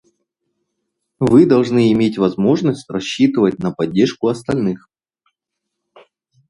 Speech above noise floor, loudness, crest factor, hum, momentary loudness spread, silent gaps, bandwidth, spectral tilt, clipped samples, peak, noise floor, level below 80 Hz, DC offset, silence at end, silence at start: 64 dB; -16 LUFS; 18 dB; none; 10 LU; none; 11.5 kHz; -7 dB/octave; under 0.1%; 0 dBFS; -79 dBFS; -52 dBFS; under 0.1%; 1.7 s; 1.2 s